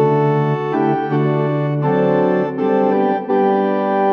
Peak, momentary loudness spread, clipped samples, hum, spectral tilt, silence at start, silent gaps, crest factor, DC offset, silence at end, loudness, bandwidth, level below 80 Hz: -4 dBFS; 3 LU; under 0.1%; none; -10 dB/octave; 0 s; none; 12 dB; under 0.1%; 0 s; -17 LUFS; 5.8 kHz; -78 dBFS